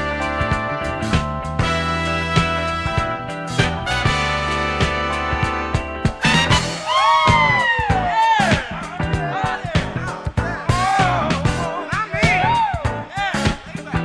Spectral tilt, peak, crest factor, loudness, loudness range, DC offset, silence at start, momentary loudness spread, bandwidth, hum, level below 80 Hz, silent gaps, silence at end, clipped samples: -5 dB/octave; 0 dBFS; 18 dB; -19 LUFS; 4 LU; under 0.1%; 0 s; 9 LU; 11 kHz; none; -32 dBFS; none; 0 s; under 0.1%